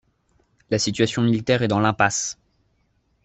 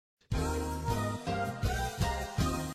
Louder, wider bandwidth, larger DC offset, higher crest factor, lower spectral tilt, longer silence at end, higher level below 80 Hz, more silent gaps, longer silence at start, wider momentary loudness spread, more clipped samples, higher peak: first, -21 LUFS vs -34 LUFS; second, 8.4 kHz vs 15.5 kHz; neither; about the same, 20 dB vs 16 dB; about the same, -4.5 dB/octave vs -5.5 dB/octave; first, 0.9 s vs 0 s; second, -56 dBFS vs -40 dBFS; neither; first, 0.7 s vs 0.3 s; first, 8 LU vs 2 LU; neither; first, -2 dBFS vs -18 dBFS